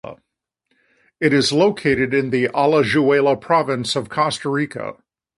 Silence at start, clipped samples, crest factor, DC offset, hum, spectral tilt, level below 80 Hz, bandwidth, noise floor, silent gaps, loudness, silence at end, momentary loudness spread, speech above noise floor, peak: 0.05 s; under 0.1%; 18 dB; under 0.1%; none; -5 dB/octave; -54 dBFS; 11.5 kHz; -79 dBFS; none; -18 LUFS; 0.45 s; 7 LU; 61 dB; -2 dBFS